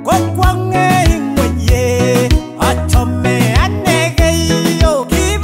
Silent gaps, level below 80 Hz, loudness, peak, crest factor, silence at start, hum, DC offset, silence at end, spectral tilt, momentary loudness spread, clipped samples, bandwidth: none; -18 dBFS; -13 LUFS; 0 dBFS; 10 dB; 0 s; none; under 0.1%; 0 s; -5 dB/octave; 3 LU; under 0.1%; 16.5 kHz